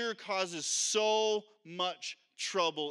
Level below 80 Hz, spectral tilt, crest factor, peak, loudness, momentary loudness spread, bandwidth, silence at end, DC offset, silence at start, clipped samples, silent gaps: under -90 dBFS; -1 dB/octave; 18 dB; -16 dBFS; -32 LUFS; 12 LU; 13 kHz; 0 s; under 0.1%; 0 s; under 0.1%; none